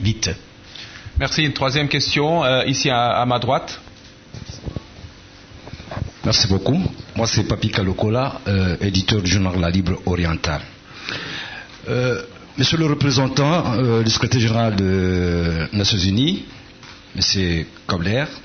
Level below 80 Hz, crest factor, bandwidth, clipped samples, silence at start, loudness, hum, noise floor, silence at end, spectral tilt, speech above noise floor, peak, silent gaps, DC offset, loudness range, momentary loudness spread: -38 dBFS; 16 dB; 6.6 kHz; under 0.1%; 0 s; -19 LUFS; none; -43 dBFS; 0 s; -5 dB/octave; 24 dB; -4 dBFS; none; under 0.1%; 5 LU; 16 LU